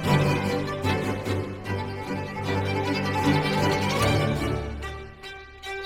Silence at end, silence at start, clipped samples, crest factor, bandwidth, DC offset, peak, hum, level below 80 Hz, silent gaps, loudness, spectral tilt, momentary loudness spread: 0 s; 0 s; under 0.1%; 16 dB; 16 kHz; under 0.1%; -10 dBFS; none; -44 dBFS; none; -26 LUFS; -6 dB/octave; 13 LU